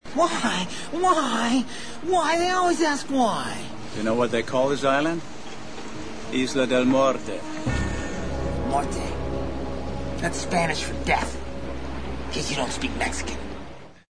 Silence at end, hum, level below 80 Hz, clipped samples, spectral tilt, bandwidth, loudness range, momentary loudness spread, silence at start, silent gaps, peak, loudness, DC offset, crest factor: 0 s; none; -38 dBFS; under 0.1%; -4.5 dB/octave; 10.5 kHz; 5 LU; 13 LU; 0 s; none; -8 dBFS; -25 LUFS; 2%; 18 dB